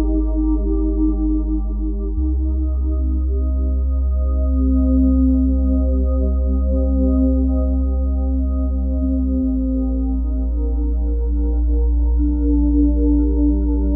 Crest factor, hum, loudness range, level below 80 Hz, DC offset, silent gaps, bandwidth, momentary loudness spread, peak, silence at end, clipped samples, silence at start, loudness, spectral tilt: 10 dB; none; 3 LU; -18 dBFS; under 0.1%; none; 1.3 kHz; 5 LU; -6 dBFS; 0 s; under 0.1%; 0 s; -19 LUFS; -15.5 dB/octave